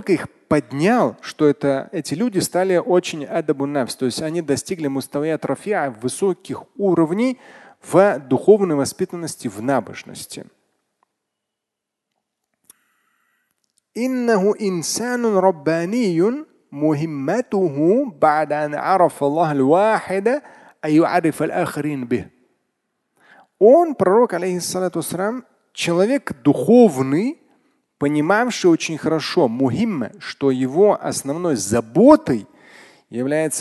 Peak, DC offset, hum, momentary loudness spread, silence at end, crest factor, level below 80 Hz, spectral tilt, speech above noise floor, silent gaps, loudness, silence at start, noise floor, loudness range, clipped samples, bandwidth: 0 dBFS; under 0.1%; none; 11 LU; 0 s; 18 dB; -58 dBFS; -5.5 dB/octave; 64 dB; none; -19 LUFS; 0 s; -82 dBFS; 5 LU; under 0.1%; 12.5 kHz